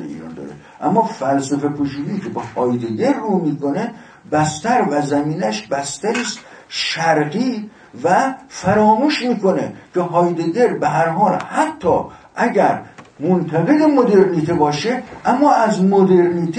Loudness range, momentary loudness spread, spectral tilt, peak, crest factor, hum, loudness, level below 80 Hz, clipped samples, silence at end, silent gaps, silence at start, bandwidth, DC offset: 4 LU; 11 LU; -6 dB/octave; 0 dBFS; 16 dB; none; -17 LUFS; -54 dBFS; under 0.1%; 0 s; none; 0 s; 10 kHz; under 0.1%